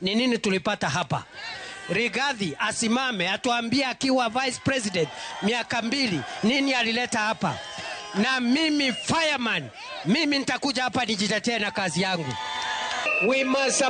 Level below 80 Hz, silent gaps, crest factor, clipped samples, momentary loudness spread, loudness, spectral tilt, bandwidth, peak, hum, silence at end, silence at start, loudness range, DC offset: -62 dBFS; none; 14 dB; under 0.1%; 8 LU; -25 LUFS; -3.5 dB/octave; 9.6 kHz; -12 dBFS; none; 0 s; 0 s; 2 LU; under 0.1%